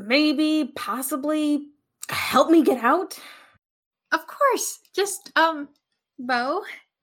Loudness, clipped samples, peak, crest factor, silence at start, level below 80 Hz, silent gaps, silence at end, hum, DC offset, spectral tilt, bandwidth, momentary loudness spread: -22 LUFS; under 0.1%; -4 dBFS; 18 dB; 0 s; -76 dBFS; 3.70-3.91 s; 0.25 s; none; under 0.1%; -2.5 dB/octave; 17.5 kHz; 17 LU